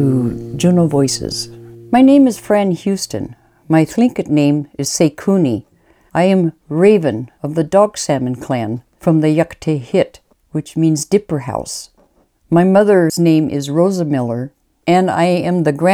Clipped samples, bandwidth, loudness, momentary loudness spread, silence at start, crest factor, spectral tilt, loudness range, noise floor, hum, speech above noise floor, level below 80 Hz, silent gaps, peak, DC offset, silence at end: under 0.1%; 15.5 kHz; -15 LUFS; 12 LU; 0 s; 14 dB; -6 dB/octave; 3 LU; -55 dBFS; none; 41 dB; -50 dBFS; none; 0 dBFS; under 0.1%; 0 s